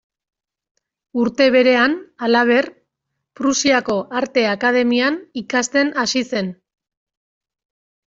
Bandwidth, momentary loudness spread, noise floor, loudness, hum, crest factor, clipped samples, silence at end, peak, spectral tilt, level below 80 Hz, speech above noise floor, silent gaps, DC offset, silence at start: 7.8 kHz; 9 LU; -78 dBFS; -17 LUFS; none; 18 dB; under 0.1%; 1.6 s; -2 dBFS; -3 dB/octave; -62 dBFS; 61 dB; none; under 0.1%; 1.15 s